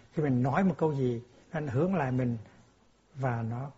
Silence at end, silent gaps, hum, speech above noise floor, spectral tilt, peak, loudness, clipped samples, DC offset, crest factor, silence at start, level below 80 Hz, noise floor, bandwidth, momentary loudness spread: 0.05 s; none; none; 34 dB; -8.5 dB/octave; -12 dBFS; -31 LUFS; under 0.1%; under 0.1%; 18 dB; 0.15 s; -60 dBFS; -64 dBFS; 7.6 kHz; 10 LU